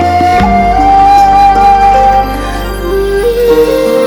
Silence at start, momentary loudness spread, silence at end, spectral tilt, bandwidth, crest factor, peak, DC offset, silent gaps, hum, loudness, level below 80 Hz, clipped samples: 0 s; 10 LU; 0 s; -5.5 dB/octave; 18.5 kHz; 6 dB; 0 dBFS; under 0.1%; none; 50 Hz at -30 dBFS; -7 LUFS; -20 dBFS; 0.8%